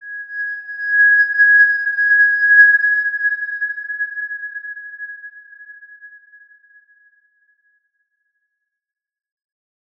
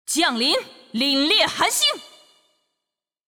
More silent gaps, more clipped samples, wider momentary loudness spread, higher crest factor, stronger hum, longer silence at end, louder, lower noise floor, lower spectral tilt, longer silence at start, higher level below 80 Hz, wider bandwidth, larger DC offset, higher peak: neither; neither; first, 21 LU vs 8 LU; about the same, 18 dB vs 16 dB; neither; first, 3.9 s vs 1.2 s; first, -13 LUFS vs -19 LUFS; second, -76 dBFS vs -85 dBFS; second, 2 dB/octave vs -1 dB/octave; about the same, 0 s vs 0.1 s; second, -86 dBFS vs -66 dBFS; second, 5.2 kHz vs over 20 kHz; neither; first, -2 dBFS vs -6 dBFS